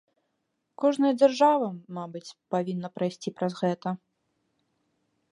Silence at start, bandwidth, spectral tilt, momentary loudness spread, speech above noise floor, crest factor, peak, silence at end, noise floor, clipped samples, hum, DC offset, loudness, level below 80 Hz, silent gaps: 0.8 s; 11 kHz; -6.5 dB/octave; 16 LU; 52 dB; 20 dB; -8 dBFS; 1.35 s; -78 dBFS; under 0.1%; none; under 0.1%; -26 LUFS; -80 dBFS; none